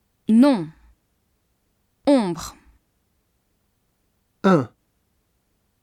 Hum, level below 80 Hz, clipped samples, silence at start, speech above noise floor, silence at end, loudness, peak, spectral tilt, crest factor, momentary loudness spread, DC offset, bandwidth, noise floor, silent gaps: none; -58 dBFS; under 0.1%; 0.3 s; 51 dB; 1.15 s; -20 LUFS; -4 dBFS; -7 dB/octave; 20 dB; 19 LU; under 0.1%; 13.5 kHz; -69 dBFS; none